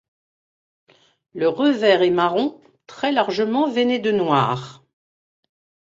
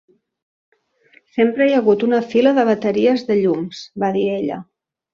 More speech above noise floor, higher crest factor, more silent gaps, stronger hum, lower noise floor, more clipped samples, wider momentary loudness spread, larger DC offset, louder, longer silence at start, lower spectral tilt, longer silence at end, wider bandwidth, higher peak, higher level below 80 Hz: first, over 71 dB vs 38 dB; about the same, 20 dB vs 16 dB; neither; neither; first, under -90 dBFS vs -55 dBFS; neither; about the same, 10 LU vs 10 LU; neither; about the same, -19 LUFS vs -17 LUFS; about the same, 1.35 s vs 1.35 s; about the same, -6 dB/octave vs -7 dB/octave; first, 1.25 s vs 0.5 s; about the same, 7.8 kHz vs 7.2 kHz; about the same, -2 dBFS vs -2 dBFS; about the same, -64 dBFS vs -62 dBFS